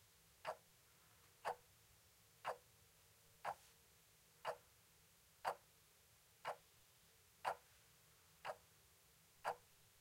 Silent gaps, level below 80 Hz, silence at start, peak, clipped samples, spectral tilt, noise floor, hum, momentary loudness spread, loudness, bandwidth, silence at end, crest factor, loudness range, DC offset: none; -84 dBFS; 0.45 s; -26 dBFS; under 0.1%; -2 dB/octave; -72 dBFS; none; 20 LU; -52 LUFS; 16 kHz; 0.25 s; 28 dB; 2 LU; under 0.1%